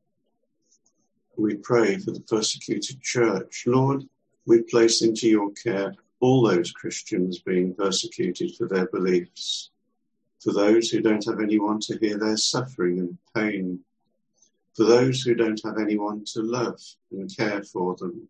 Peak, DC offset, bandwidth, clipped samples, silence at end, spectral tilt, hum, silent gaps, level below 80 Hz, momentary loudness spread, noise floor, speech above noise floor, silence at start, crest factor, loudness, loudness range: -4 dBFS; under 0.1%; 9.8 kHz; under 0.1%; 0.05 s; -4.5 dB/octave; none; none; -68 dBFS; 11 LU; -78 dBFS; 54 dB; 1.35 s; 20 dB; -24 LUFS; 4 LU